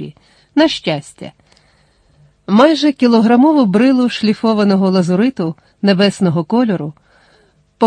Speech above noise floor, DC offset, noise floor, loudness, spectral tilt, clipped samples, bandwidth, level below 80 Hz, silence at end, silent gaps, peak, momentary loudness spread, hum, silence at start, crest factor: 41 dB; under 0.1%; -53 dBFS; -13 LUFS; -6.5 dB/octave; under 0.1%; 10 kHz; -56 dBFS; 0 s; none; 0 dBFS; 14 LU; none; 0 s; 14 dB